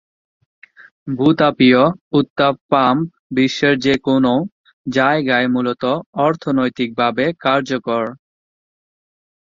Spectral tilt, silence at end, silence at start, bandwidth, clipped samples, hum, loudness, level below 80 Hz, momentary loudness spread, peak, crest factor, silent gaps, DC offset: -6.5 dB/octave; 1.3 s; 1.05 s; 7.6 kHz; under 0.1%; none; -16 LUFS; -56 dBFS; 8 LU; -2 dBFS; 16 dB; 2.01-2.11 s, 2.30-2.36 s, 2.61-2.69 s, 3.19-3.30 s, 4.52-4.64 s, 4.73-4.84 s, 6.06-6.13 s; under 0.1%